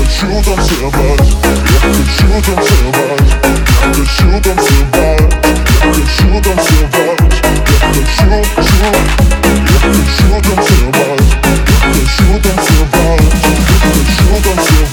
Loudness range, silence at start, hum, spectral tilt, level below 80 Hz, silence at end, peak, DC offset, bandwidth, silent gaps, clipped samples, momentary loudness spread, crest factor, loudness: 0 LU; 0 s; none; -5 dB/octave; -10 dBFS; 0 s; 0 dBFS; under 0.1%; 19 kHz; none; 0.5%; 2 LU; 8 dB; -9 LUFS